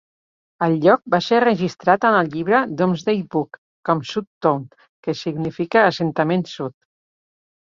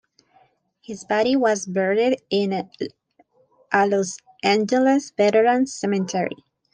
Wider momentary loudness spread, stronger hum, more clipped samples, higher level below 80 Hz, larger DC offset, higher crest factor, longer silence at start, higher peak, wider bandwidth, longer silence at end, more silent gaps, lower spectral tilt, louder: about the same, 12 LU vs 13 LU; neither; neither; first, -62 dBFS vs -68 dBFS; neither; about the same, 18 dB vs 18 dB; second, 0.6 s vs 0.9 s; about the same, -2 dBFS vs -4 dBFS; second, 7.6 kHz vs 10 kHz; first, 1.05 s vs 0.4 s; first, 3.58-3.83 s, 4.27-4.41 s, 4.89-5.03 s vs none; first, -6.5 dB/octave vs -4.5 dB/octave; about the same, -19 LUFS vs -21 LUFS